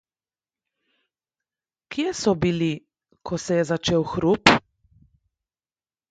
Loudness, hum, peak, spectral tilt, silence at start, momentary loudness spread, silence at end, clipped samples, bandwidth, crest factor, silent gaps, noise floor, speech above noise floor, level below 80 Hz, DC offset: -22 LUFS; none; 0 dBFS; -5 dB/octave; 1.9 s; 15 LU; 1.5 s; under 0.1%; 9.4 kHz; 26 dB; none; under -90 dBFS; over 69 dB; -52 dBFS; under 0.1%